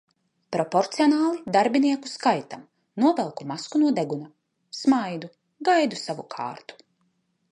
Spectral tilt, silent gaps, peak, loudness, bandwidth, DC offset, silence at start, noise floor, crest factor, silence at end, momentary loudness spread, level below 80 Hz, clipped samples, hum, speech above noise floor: -5 dB/octave; none; -6 dBFS; -24 LUFS; 11 kHz; under 0.1%; 0.5 s; -71 dBFS; 18 dB; 0.8 s; 15 LU; -74 dBFS; under 0.1%; none; 47 dB